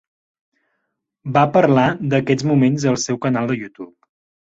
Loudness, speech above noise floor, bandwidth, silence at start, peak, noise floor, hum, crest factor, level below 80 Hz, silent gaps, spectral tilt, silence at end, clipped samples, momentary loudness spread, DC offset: -17 LUFS; 58 dB; 7.8 kHz; 1.25 s; -2 dBFS; -75 dBFS; none; 16 dB; -56 dBFS; none; -6 dB/octave; 0.65 s; under 0.1%; 20 LU; under 0.1%